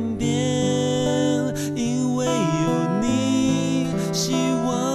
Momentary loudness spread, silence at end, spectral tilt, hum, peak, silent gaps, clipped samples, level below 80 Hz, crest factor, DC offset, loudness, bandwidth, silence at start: 3 LU; 0 s; -5.5 dB/octave; none; -10 dBFS; none; under 0.1%; -48 dBFS; 12 dB; under 0.1%; -22 LUFS; 14 kHz; 0 s